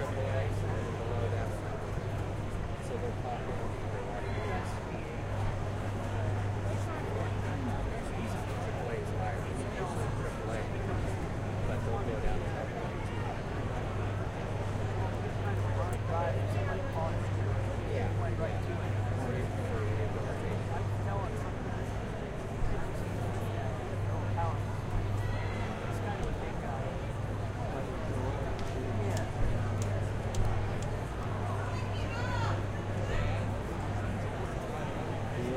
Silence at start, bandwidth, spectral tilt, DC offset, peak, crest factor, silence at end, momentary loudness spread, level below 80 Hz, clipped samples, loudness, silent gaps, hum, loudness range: 0 s; 12.5 kHz; -7 dB/octave; under 0.1%; -16 dBFS; 16 dB; 0 s; 4 LU; -42 dBFS; under 0.1%; -35 LUFS; none; none; 3 LU